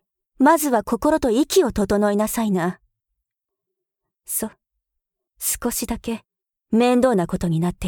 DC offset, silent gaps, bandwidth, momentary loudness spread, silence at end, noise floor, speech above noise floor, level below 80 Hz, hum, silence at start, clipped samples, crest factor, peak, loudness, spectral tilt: under 0.1%; none; 19.5 kHz; 10 LU; 0 s; -83 dBFS; 64 dB; -44 dBFS; none; 0.4 s; under 0.1%; 18 dB; -4 dBFS; -20 LUFS; -5 dB/octave